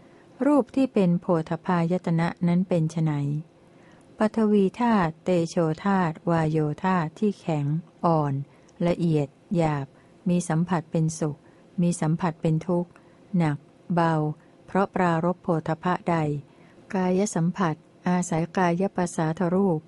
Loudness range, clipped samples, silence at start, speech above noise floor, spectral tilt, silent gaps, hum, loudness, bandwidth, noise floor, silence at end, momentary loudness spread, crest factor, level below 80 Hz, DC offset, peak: 2 LU; under 0.1%; 0.4 s; 29 dB; -7.5 dB/octave; none; none; -25 LUFS; 11.5 kHz; -53 dBFS; 0.05 s; 7 LU; 16 dB; -60 dBFS; under 0.1%; -8 dBFS